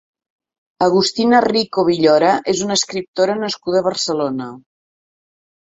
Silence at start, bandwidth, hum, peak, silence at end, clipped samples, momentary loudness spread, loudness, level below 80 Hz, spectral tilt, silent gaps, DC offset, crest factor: 0.8 s; 8.2 kHz; none; -2 dBFS; 1 s; under 0.1%; 8 LU; -16 LUFS; -58 dBFS; -4 dB/octave; 3.08-3.14 s; under 0.1%; 16 dB